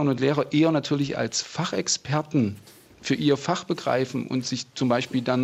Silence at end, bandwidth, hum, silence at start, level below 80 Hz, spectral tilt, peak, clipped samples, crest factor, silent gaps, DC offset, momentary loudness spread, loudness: 0 s; 14 kHz; none; 0 s; -64 dBFS; -5 dB/octave; -8 dBFS; under 0.1%; 16 dB; none; under 0.1%; 6 LU; -25 LUFS